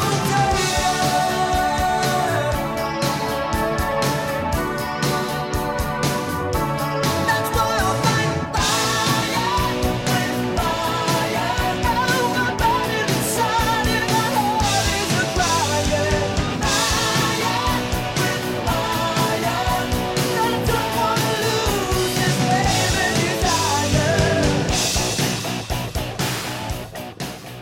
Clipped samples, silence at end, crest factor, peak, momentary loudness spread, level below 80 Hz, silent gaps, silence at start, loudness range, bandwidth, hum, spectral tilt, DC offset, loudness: under 0.1%; 0 s; 14 dB; -6 dBFS; 5 LU; -34 dBFS; none; 0 s; 3 LU; 16.5 kHz; none; -4 dB/octave; under 0.1%; -20 LUFS